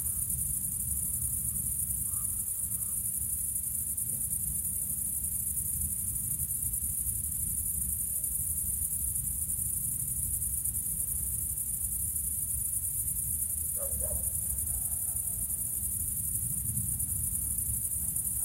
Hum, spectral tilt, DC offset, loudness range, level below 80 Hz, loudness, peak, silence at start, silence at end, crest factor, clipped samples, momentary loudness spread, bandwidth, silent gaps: none; -3 dB/octave; under 0.1%; 0 LU; -46 dBFS; -30 LUFS; -16 dBFS; 0 s; 0 s; 16 dB; under 0.1%; 1 LU; 16 kHz; none